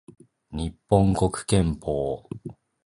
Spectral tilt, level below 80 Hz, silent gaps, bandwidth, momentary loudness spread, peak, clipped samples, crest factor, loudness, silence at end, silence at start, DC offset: -6.5 dB/octave; -40 dBFS; none; 11.5 kHz; 18 LU; -4 dBFS; under 0.1%; 20 dB; -25 LUFS; 0.35 s; 0.5 s; under 0.1%